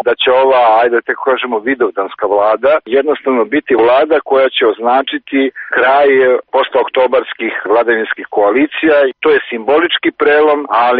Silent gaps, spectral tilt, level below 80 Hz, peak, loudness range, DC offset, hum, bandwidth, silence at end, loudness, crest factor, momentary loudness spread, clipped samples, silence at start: none; -0.5 dB/octave; -56 dBFS; 0 dBFS; 1 LU; under 0.1%; none; 4.8 kHz; 0 s; -12 LUFS; 10 dB; 6 LU; under 0.1%; 0.05 s